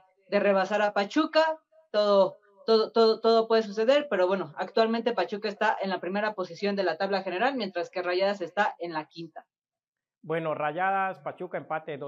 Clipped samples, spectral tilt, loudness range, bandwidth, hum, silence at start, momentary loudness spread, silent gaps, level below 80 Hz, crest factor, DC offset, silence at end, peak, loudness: under 0.1%; -5.5 dB/octave; 7 LU; 7.6 kHz; none; 0.3 s; 11 LU; 9.88-9.93 s; under -90 dBFS; 18 dB; under 0.1%; 0 s; -10 dBFS; -27 LUFS